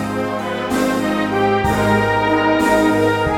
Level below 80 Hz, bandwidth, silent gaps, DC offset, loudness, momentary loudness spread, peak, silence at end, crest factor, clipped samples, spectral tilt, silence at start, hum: -38 dBFS; 17 kHz; none; under 0.1%; -16 LUFS; 7 LU; -2 dBFS; 0 s; 14 dB; under 0.1%; -5.5 dB/octave; 0 s; none